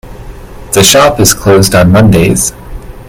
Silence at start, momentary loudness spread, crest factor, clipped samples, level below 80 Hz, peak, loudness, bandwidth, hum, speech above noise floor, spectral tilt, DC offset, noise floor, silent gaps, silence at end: 0.05 s; 7 LU; 8 dB; 1%; -26 dBFS; 0 dBFS; -6 LUFS; over 20 kHz; none; 20 dB; -4 dB/octave; under 0.1%; -26 dBFS; none; 0 s